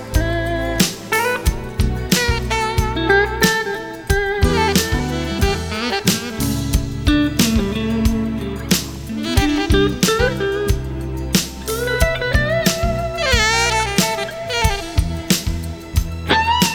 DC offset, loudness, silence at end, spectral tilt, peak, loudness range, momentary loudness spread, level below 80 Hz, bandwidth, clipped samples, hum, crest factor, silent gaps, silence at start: under 0.1%; -18 LUFS; 0 s; -4 dB/octave; 0 dBFS; 2 LU; 7 LU; -26 dBFS; over 20 kHz; under 0.1%; none; 18 dB; none; 0 s